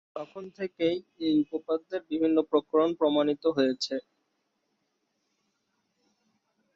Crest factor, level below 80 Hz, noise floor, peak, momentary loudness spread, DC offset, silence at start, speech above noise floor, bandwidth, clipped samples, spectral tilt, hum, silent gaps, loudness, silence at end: 18 dB; -72 dBFS; -78 dBFS; -12 dBFS; 13 LU; under 0.1%; 0.15 s; 50 dB; 7.6 kHz; under 0.1%; -5.5 dB/octave; none; none; -28 LUFS; 2.75 s